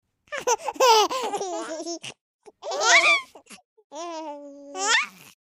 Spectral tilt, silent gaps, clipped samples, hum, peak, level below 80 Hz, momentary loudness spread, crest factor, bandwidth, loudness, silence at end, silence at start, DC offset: 0.5 dB/octave; 2.21-2.39 s, 3.65-3.76 s, 3.84-3.90 s; under 0.1%; none; -4 dBFS; -76 dBFS; 22 LU; 22 dB; 15.5 kHz; -21 LUFS; 0.3 s; 0.3 s; under 0.1%